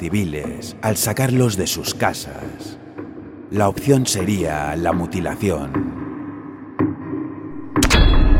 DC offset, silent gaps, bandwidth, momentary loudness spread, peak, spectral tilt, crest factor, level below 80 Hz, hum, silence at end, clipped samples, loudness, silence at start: under 0.1%; none; 16.5 kHz; 16 LU; 0 dBFS; -5 dB/octave; 18 dB; -24 dBFS; none; 0 s; under 0.1%; -20 LUFS; 0 s